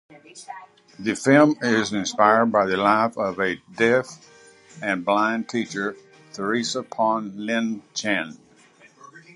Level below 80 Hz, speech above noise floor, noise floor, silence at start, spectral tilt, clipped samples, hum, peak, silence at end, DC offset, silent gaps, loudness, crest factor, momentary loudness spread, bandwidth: -66 dBFS; 31 dB; -53 dBFS; 0.1 s; -4.5 dB/octave; under 0.1%; none; -2 dBFS; 0.15 s; under 0.1%; none; -22 LUFS; 22 dB; 16 LU; 11.5 kHz